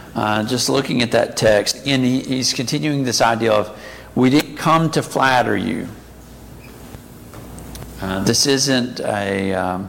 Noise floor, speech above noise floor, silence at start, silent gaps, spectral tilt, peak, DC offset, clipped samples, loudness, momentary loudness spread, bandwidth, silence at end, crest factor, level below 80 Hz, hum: -39 dBFS; 22 dB; 0 s; none; -4 dB/octave; -2 dBFS; under 0.1%; under 0.1%; -17 LUFS; 20 LU; 17 kHz; 0 s; 18 dB; -46 dBFS; none